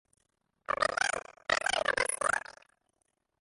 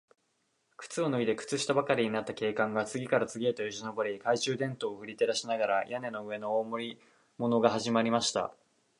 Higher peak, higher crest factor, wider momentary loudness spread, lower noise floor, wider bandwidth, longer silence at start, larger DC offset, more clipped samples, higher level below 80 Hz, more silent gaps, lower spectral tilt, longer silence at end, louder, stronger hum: second, -12 dBFS vs -8 dBFS; about the same, 22 dB vs 22 dB; about the same, 9 LU vs 10 LU; about the same, -79 dBFS vs -76 dBFS; about the same, 12 kHz vs 11.5 kHz; about the same, 0.7 s vs 0.8 s; neither; neither; first, -64 dBFS vs -74 dBFS; neither; second, -0.5 dB/octave vs -4 dB/octave; first, 0.9 s vs 0.5 s; about the same, -31 LUFS vs -31 LUFS; neither